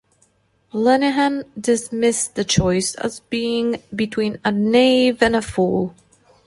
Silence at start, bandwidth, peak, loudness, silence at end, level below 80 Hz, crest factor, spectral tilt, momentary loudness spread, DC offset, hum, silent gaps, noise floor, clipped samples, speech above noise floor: 0.75 s; 11.5 kHz; -2 dBFS; -19 LUFS; 0.55 s; -46 dBFS; 18 dB; -4.5 dB/octave; 9 LU; under 0.1%; none; none; -61 dBFS; under 0.1%; 42 dB